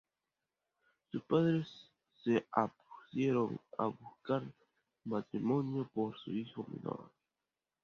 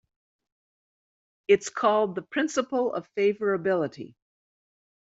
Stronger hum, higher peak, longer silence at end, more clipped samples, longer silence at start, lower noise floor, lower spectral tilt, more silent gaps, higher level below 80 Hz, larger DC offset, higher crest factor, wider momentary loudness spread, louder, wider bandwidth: neither; second, -14 dBFS vs -8 dBFS; second, 0.75 s vs 1.05 s; neither; second, 1.15 s vs 1.5 s; about the same, under -90 dBFS vs under -90 dBFS; first, -7 dB/octave vs -4 dB/octave; neither; about the same, -78 dBFS vs -74 dBFS; neither; about the same, 24 dB vs 20 dB; about the same, 13 LU vs 11 LU; second, -37 LUFS vs -26 LUFS; second, 7 kHz vs 8 kHz